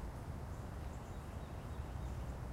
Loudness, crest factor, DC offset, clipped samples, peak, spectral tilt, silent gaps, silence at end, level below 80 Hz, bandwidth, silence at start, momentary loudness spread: -47 LUFS; 12 dB; under 0.1%; under 0.1%; -32 dBFS; -6.5 dB/octave; none; 0 s; -48 dBFS; 16 kHz; 0 s; 3 LU